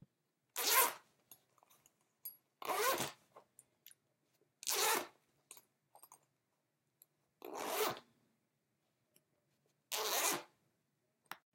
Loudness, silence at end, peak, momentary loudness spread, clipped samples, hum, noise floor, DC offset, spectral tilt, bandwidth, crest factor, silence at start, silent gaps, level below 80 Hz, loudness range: -36 LUFS; 0.2 s; -14 dBFS; 23 LU; under 0.1%; none; -85 dBFS; under 0.1%; 0 dB/octave; 16.5 kHz; 30 dB; 0.55 s; none; under -90 dBFS; 9 LU